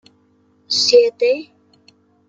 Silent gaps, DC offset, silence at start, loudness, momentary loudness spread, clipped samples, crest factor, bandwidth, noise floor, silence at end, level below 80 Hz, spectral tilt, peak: none; under 0.1%; 0.7 s; -15 LUFS; 9 LU; under 0.1%; 18 dB; 8.8 kHz; -57 dBFS; 0.85 s; -74 dBFS; -0.5 dB/octave; -2 dBFS